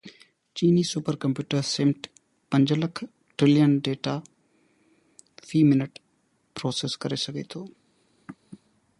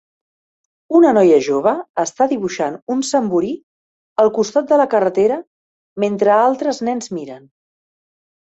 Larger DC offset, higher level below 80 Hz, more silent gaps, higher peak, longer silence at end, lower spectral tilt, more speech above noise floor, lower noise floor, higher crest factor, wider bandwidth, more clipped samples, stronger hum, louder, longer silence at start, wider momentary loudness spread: neither; about the same, -66 dBFS vs -62 dBFS; second, none vs 1.89-1.94 s, 2.82-2.87 s, 3.63-4.16 s, 5.47-5.96 s; second, -8 dBFS vs -2 dBFS; second, 0.45 s vs 1.1 s; about the same, -6 dB/octave vs -5 dB/octave; second, 45 dB vs over 75 dB; second, -69 dBFS vs under -90 dBFS; about the same, 18 dB vs 16 dB; first, 11.5 kHz vs 8.2 kHz; neither; neither; second, -25 LUFS vs -16 LUFS; second, 0.05 s vs 0.9 s; first, 18 LU vs 13 LU